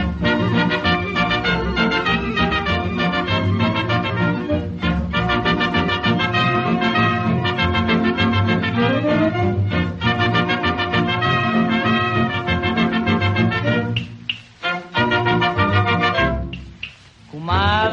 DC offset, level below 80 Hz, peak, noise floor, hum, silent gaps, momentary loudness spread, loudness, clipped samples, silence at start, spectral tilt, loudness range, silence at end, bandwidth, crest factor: under 0.1%; -34 dBFS; -4 dBFS; -40 dBFS; none; none; 5 LU; -18 LUFS; under 0.1%; 0 s; -7 dB/octave; 2 LU; 0 s; 7.4 kHz; 14 dB